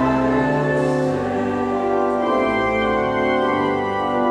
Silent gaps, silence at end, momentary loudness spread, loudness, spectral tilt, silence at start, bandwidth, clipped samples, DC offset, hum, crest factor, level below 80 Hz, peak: none; 0 s; 3 LU; -19 LUFS; -7 dB/octave; 0 s; 10.5 kHz; under 0.1%; under 0.1%; none; 12 dB; -44 dBFS; -6 dBFS